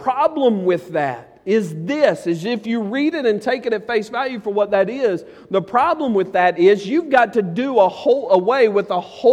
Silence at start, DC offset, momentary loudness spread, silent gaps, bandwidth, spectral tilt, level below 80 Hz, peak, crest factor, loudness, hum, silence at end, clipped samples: 0 s; under 0.1%; 7 LU; none; 11 kHz; -6.5 dB/octave; -62 dBFS; -2 dBFS; 16 dB; -18 LUFS; none; 0 s; under 0.1%